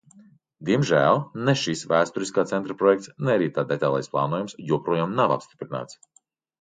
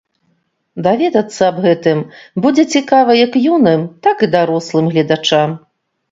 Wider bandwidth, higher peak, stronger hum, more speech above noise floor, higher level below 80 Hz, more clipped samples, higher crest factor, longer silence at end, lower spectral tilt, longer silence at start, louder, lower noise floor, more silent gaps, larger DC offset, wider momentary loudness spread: first, 9.4 kHz vs 7.8 kHz; second, -6 dBFS vs 0 dBFS; neither; second, 31 dB vs 50 dB; second, -66 dBFS vs -58 dBFS; neither; about the same, 18 dB vs 14 dB; first, 0.7 s vs 0.55 s; about the same, -5.5 dB/octave vs -5.5 dB/octave; second, 0.6 s vs 0.75 s; second, -24 LUFS vs -13 LUFS; second, -54 dBFS vs -63 dBFS; neither; neither; first, 11 LU vs 8 LU